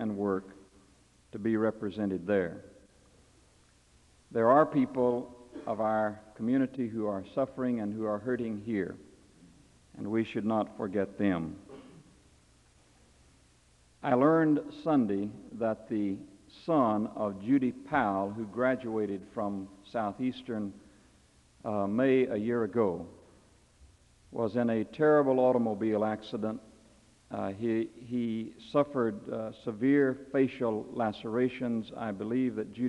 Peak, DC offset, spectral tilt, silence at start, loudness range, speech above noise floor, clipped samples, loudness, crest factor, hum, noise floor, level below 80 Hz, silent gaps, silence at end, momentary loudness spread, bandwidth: -10 dBFS; under 0.1%; -8 dB/octave; 0 s; 5 LU; 33 dB; under 0.1%; -31 LUFS; 20 dB; none; -63 dBFS; -68 dBFS; none; 0 s; 12 LU; 11 kHz